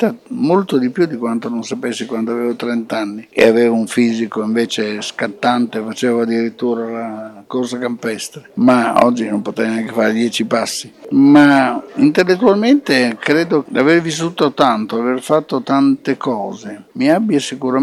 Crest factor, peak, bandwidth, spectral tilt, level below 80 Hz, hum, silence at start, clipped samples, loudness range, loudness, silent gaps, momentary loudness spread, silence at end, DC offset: 14 dB; 0 dBFS; 13 kHz; -5 dB/octave; -60 dBFS; none; 0 s; under 0.1%; 6 LU; -15 LUFS; none; 10 LU; 0 s; under 0.1%